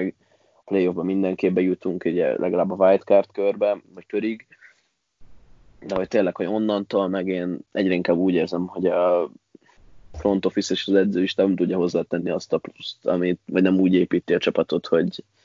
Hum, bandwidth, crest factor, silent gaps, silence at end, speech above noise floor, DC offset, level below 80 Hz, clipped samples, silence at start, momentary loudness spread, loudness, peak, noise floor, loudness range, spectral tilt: none; 7.6 kHz; 18 dB; none; 0.25 s; 45 dB; under 0.1%; -56 dBFS; under 0.1%; 0 s; 9 LU; -22 LUFS; -4 dBFS; -67 dBFS; 5 LU; -6.5 dB/octave